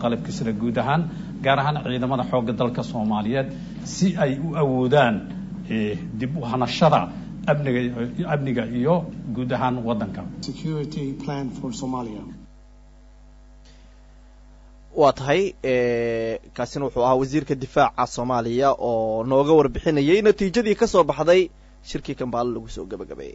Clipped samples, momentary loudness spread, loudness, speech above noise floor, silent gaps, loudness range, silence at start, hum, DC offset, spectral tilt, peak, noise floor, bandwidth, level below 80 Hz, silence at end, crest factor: under 0.1%; 13 LU; -22 LUFS; 26 dB; none; 11 LU; 0 s; none; under 0.1%; -6.5 dB/octave; -6 dBFS; -48 dBFS; 8 kHz; -46 dBFS; 0 s; 18 dB